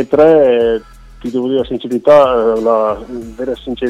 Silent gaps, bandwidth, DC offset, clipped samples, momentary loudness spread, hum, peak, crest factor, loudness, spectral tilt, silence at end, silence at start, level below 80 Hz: none; 9.6 kHz; under 0.1%; under 0.1%; 14 LU; none; 0 dBFS; 12 dB; -12 LUFS; -7 dB/octave; 0 s; 0 s; -40 dBFS